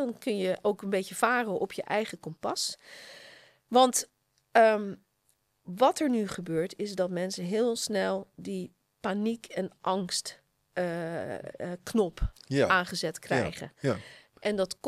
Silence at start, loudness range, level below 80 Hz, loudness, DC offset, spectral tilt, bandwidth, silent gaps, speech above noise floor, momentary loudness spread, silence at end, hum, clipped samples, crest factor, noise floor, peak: 0 s; 6 LU; -50 dBFS; -30 LUFS; under 0.1%; -4 dB/octave; 15.5 kHz; none; 44 dB; 14 LU; 0 s; none; under 0.1%; 22 dB; -73 dBFS; -8 dBFS